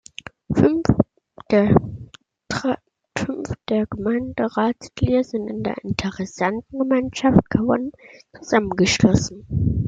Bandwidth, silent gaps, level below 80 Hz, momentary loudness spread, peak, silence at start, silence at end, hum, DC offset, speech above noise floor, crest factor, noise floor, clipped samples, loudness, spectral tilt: 9.2 kHz; none; -42 dBFS; 12 LU; -2 dBFS; 0.5 s; 0 s; none; under 0.1%; 24 dB; 20 dB; -44 dBFS; under 0.1%; -21 LUFS; -6 dB/octave